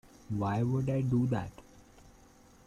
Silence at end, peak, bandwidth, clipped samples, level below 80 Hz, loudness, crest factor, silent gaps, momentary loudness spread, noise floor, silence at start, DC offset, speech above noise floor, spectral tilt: 0.6 s; -20 dBFS; 9.8 kHz; under 0.1%; -58 dBFS; -32 LUFS; 14 dB; none; 9 LU; -59 dBFS; 0.3 s; under 0.1%; 29 dB; -9 dB/octave